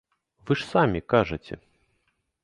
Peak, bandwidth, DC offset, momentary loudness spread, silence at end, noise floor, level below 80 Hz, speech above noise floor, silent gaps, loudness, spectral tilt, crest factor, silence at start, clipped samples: -6 dBFS; 11.5 kHz; under 0.1%; 18 LU; 0.9 s; -73 dBFS; -50 dBFS; 49 dB; none; -25 LUFS; -7 dB/octave; 22 dB; 0.45 s; under 0.1%